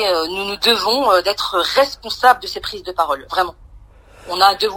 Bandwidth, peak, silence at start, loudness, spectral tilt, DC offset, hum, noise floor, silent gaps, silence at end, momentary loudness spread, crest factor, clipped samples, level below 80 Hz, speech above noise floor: 16 kHz; 0 dBFS; 0 s; -17 LUFS; -2 dB/octave; under 0.1%; none; -43 dBFS; none; 0 s; 10 LU; 18 dB; under 0.1%; -46 dBFS; 26 dB